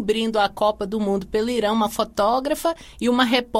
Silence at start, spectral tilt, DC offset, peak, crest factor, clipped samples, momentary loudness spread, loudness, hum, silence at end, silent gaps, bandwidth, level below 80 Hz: 0 s; -4.5 dB/octave; under 0.1%; -4 dBFS; 16 dB; under 0.1%; 5 LU; -22 LUFS; none; 0 s; none; 16.5 kHz; -48 dBFS